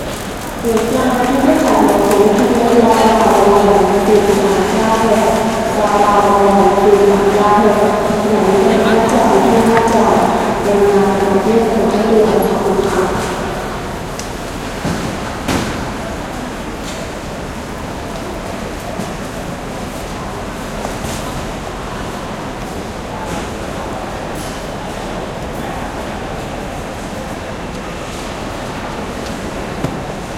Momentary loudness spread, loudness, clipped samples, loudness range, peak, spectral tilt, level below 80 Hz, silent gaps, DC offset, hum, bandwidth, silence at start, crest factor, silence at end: 14 LU; -15 LUFS; under 0.1%; 13 LU; 0 dBFS; -5 dB/octave; -32 dBFS; none; under 0.1%; none; 16.5 kHz; 0 s; 14 dB; 0 s